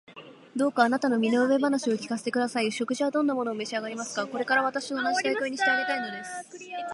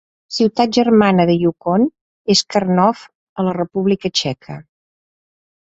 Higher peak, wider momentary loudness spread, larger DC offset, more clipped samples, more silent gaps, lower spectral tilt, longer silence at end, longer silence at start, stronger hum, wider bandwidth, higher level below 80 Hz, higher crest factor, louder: second, -6 dBFS vs -2 dBFS; second, 13 LU vs 17 LU; neither; neither; second, none vs 2.01-2.25 s, 3.15-3.36 s; second, -3.5 dB/octave vs -5.5 dB/octave; second, 0 s vs 1.15 s; second, 0.1 s vs 0.3 s; neither; first, 11.5 kHz vs 8 kHz; second, -80 dBFS vs -54 dBFS; about the same, 20 dB vs 16 dB; second, -27 LUFS vs -16 LUFS